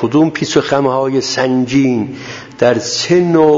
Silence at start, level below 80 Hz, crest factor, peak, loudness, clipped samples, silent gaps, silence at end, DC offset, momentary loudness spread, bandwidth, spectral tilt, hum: 0 s; -50 dBFS; 12 dB; 0 dBFS; -13 LUFS; under 0.1%; none; 0 s; under 0.1%; 7 LU; 7.8 kHz; -5 dB/octave; none